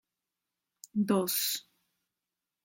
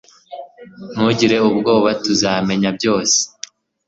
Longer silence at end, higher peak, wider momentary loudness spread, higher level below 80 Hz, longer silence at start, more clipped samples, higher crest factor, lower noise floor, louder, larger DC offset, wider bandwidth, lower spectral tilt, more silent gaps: first, 1.05 s vs 0.6 s; second, -16 dBFS vs -2 dBFS; second, 10 LU vs 21 LU; second, -80 dBFS vs -54 dBFS; first, 0.95 s vs 0.3 s; neither; about the same, 20 dB vs 16 dB; first, -89 dBFS vs -38 dBFS; second, -31 LUFS vs -16 LUFS; neither; first, 17 kHz vs 8 kHz; about the same, -4 dB/octave vs -3.5 dB/octave; neither